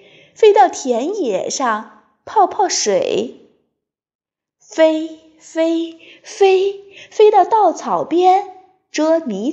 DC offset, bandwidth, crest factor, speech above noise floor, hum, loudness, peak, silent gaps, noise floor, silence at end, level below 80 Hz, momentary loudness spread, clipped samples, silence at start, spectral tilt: under 0.1%; 8.4 kHz; 16 dB; 61 dB; none; -15 LUFS; 0 dBFS; 4.15-4.19 s; -76 dBFS; 0 s; -72 dBFS; 16 LU; under 0.1%; 0.4 s; -3 dB/octave